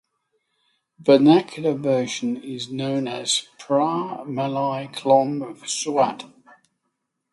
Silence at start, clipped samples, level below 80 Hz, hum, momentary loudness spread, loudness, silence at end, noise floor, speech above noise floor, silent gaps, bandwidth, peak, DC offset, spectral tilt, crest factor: 1 s; under 0.1%; -70 dBFS; none; 11 LU; -22 LUFS; 1.05 s; -77 dBFS; 55 dB; none; 11.5 kHz; -2 dBFS; under 0.1%; -4.5 dB/octave; 20 dB